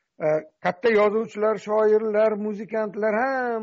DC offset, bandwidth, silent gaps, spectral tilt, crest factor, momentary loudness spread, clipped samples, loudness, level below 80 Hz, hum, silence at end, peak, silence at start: under 0.1%; 7.6 kHz; none; -4.5 dB/octave; 12 dB; 8 LU; under 0.1%; -23 LUFS; -70 dBFS; none; 0 s; -10 dBFS; 0.2 s